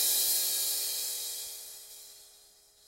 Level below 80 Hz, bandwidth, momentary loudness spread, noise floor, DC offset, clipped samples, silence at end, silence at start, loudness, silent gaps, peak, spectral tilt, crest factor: -72 dBFS; 16 kHz; 22 LU; -60 dBFS; under 0.1%; under 0.1%; 0.5 s; 0 s; -29 LUFS; none; -14 dBFS; 3.5 dB/octave; 20 dB